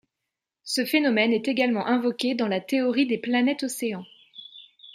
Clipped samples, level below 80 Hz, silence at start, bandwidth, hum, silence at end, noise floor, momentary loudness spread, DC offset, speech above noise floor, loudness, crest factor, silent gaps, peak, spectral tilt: under 0.1%; -76 dBFS; 0.65 s; 15.5 kHz; none; 0 s; -85 dBFS; 21 LU; under 0.1%; 61 dB; -24 LUFS; 18 dB; none; -6 dBFS; -4 dB/octave